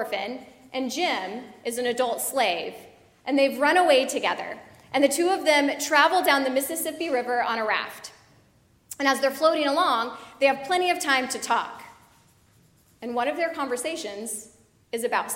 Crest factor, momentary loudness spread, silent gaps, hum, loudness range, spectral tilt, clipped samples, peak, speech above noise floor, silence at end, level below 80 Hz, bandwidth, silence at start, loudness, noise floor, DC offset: 22 dB; 15 LU; none; none; 6 LU; -1.5 dB/octave; under 0.1%; -4 dBFS; 36 dB; 0 s; -70 dBFS; 16.5 kHz; 0 s; -24 LUFS; -60 dBFS; under 0.1%